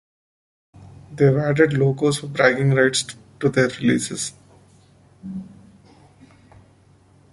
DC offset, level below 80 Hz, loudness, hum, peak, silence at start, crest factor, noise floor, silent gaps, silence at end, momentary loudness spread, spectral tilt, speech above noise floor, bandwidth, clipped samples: under 0.1%; -56 dBFS; -19 LUFS; none; -2 dBFS; 0.8 s; 20 dB; -54 dBFS; none; 1.85 s; 18 LU; -5 dB/octave; 35 dB; 11.5 kHz; under 0.1%